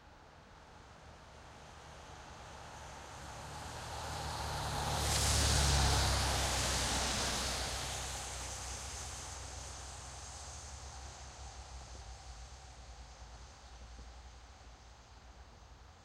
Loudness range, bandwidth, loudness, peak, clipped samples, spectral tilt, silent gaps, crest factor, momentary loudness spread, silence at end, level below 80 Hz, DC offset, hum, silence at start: 21 LU; 16.5 kHz; -36 LUFS; -18 dBFS; under 0.1%; -2.5 dB/octave; none; 22 dB; 26 LU; 0 s; -46 dBFS; under 0.1%; none; 0 s